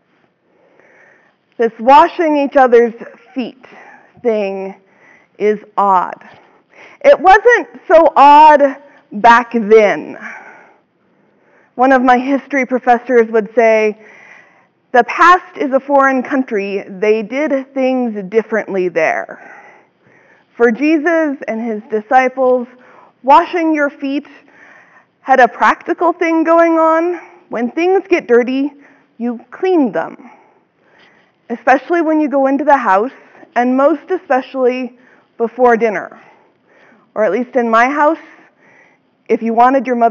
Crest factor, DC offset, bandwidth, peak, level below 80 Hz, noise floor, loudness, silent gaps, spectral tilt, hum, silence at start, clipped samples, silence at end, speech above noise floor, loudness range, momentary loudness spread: 14 dB; under 0.1%; 7.6 kHz; 0 dBFS; -54 dBFS; -57 dBFS; -12 LUFS; none; -5.5 dB/octave; none; 1.6 s; under 0.1%; 0 s; 45 dB; 8 LU; 15 LU